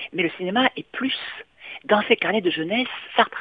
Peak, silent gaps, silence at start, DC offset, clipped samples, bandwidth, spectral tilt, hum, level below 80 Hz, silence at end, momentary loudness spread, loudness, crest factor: -2 dBFS; none; 0 s; under 0.1%; under 0.1%; 5 kHz; -7.5 dB/octave; none; -66 dBFS; 0 s; 15 LU; -22 LUFS; 20 dB